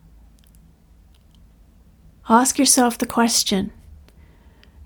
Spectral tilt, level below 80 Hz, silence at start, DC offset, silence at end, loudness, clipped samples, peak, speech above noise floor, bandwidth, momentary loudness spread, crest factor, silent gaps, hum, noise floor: -2.5 dB/octave; -48 dBFS; 2.25 s; under 0.1%; 1.15 s; -17 LUFS; under 0.1%; -2 dBFS; 34 dB; over 20 kHz; 8 LU; 22 dB; none; none; -51 dBFS